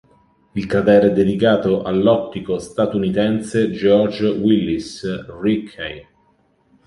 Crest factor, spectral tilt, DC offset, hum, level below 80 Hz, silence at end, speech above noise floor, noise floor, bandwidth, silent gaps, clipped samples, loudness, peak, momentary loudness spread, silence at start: 16 dB; -7 dB/octave; under 0.1%; none; -48 dBFS; 0.85 s; 42 dB; -59 dBFS; 11.5 kHz; none; under 0.1%; -18 LUFS; -2 dBFS; 13 LU; 0.55 s